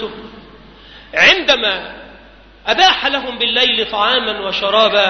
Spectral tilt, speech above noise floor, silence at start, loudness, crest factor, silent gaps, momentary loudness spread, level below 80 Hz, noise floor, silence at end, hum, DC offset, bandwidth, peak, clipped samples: -2 dB/octave; 28 dB; 0 s; -13 LUFS; 16 dB; none; 15 LU; -46 dBFS; -42 dBFS; 0 s; none; under 0.1%; 6.6 kHz; 0 dBFS; under 0.1%